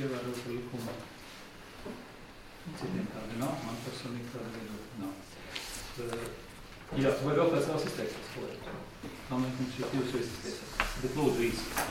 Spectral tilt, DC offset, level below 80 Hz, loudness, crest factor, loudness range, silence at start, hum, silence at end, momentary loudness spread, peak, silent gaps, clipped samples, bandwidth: -5 dB/octave; under 0.1%; -52 dBFS; -35 LUFS; 24 dB; 7 LU; 0 s; none; 0 s; 17 LU; -12 dBFS; none; under 0.1%; 16.5 kHz